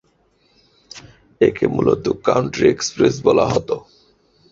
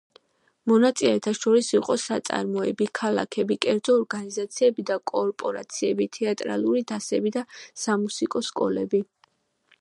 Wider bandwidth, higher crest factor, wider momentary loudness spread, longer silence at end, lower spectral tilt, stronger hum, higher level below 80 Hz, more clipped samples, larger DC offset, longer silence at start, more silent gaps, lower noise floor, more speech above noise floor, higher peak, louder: second, 7.8 kHz vs 11.5 kHz; about the same, 18 dB vs 22 dB; first, 23 LU vs 9 LU; about the same, 0.75 s vs 0.75 s; about the same, -5.5 dB/octave vs -4.5 dB/octave; neither; first, -48 dBFS vs -72 dBFS; neither; neither; first, 0.95 s vs 0.65 s; neither; second, -60 dBFS vs -65 dBFS; about the same, 43 dB vs 41 dB; about the same, -2 dBFS vs -4 dBFS; first, -18 LUFS vs -25 LUFS